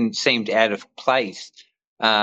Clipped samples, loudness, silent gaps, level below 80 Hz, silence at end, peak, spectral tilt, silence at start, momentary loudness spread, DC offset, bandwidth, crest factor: under 0.1%; -21 LUFS; 1.87-1.97 s; -76 dBFS; 0 s; -4 dBFS; -3 dB/octave; 0 s; 15 LU; under 0.1%; 8.4 kHz; 18 dB